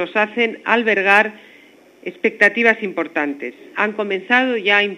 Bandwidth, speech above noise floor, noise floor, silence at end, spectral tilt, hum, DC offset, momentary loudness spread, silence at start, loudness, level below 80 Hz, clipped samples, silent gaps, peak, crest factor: 12.5 kHz; 30 dB; -48 dBFS; 0 s; -4.5 dB/octave; 50 Hz at -70 dBFS; under 0.1%; 11 LU; 0 s; -17 LUFS; -70 dBFS; under 0.1%; none; 0 dBFS; 18 dB